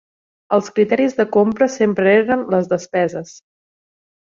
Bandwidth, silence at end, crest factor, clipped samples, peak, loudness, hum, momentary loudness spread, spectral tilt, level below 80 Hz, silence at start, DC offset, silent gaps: 7.6 kHz; 1 s; 16 dB; under 0.1%; -2 dBFS; -17 LUFS; none; 6 LU; -6 dB/octave; -60 dBFS; 0.5 s; under 0.1%; none